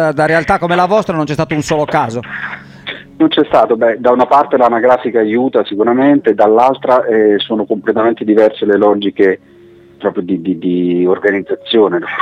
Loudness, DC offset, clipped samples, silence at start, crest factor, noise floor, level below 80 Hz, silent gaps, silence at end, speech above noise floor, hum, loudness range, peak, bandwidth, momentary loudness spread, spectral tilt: -12 LUFS; under 0.1%; under 0.1%; 0 s; 12 dB; -40 dBFS; -48 dBFS; none; 0 s; 29 dB; none; 4 LU; 0 dBFS; 10 kHz; 9 LU; -6.5 dB/octave